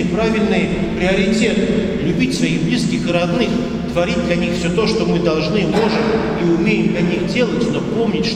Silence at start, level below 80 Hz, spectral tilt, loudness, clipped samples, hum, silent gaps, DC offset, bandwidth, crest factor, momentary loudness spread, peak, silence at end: 0 s; -34 dBFS; -6 dB/octave; -17 LUFS; under 0.1%; none; none; under 0.1%; 11.5 kHz; 14 dB; 3 LU; -2 dBFS; 0 s